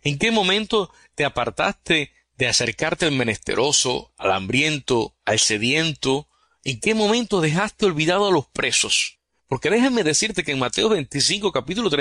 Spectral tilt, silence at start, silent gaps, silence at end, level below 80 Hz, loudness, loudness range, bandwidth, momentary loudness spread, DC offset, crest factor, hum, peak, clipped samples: -3 dB/octave; 0.05 s; none; 0 s; -50 dBFS; -20 LUFS; 1 LU; 14 kHz; 6 LU; under 0.1%; 16 dB; none; -4 dBFS; under 0.1%